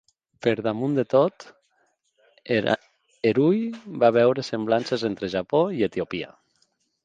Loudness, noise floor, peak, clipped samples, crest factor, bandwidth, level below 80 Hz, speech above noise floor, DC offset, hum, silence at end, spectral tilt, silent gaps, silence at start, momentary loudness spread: -24 LUFS; -69 dBFS; -4 dBFS; under 0.1%; 20 dB; 9.2 kHz; -62 dBFS; 46 dB; under 0.1%; none; 0.75 s; -7 dB/octave; none; 0.45 s; 8 LU